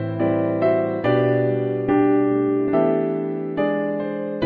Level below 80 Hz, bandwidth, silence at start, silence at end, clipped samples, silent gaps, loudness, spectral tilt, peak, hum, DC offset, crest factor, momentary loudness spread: -58 dBFS; 4.7 kHz; 0 s; 0 s; under 0.1%; none; -21 LUFS; -10.5 dB/octave; -6 dBFS; none; under 0.1%; 14 dB; 7 LU